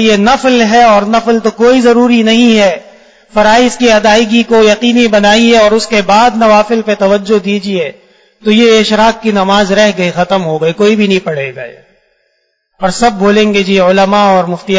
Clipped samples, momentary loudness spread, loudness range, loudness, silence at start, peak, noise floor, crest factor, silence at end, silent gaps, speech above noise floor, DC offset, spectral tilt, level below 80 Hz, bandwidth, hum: 0.8%; 8 LU; 5 LU; -8 LUFS; 0 s; 0 dBFS; -60 dBFS; 8 dB; 0 s; none; 52 dB; under 0.1%; -4.5 dB/octave; -40 dBFS; 8 kHz; none